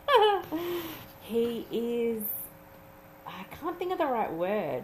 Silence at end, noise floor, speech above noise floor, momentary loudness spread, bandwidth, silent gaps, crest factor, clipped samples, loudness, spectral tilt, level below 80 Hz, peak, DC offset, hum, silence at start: 0 s; -52 dBFS; 21 dB; 17 LU; 15.5 kHz; none; 20 dB; under 0.1%; -30 LUFS; -4.5 dB/octave; -62 dBFS; -10 dBFS; under 0.1%; none; 0 s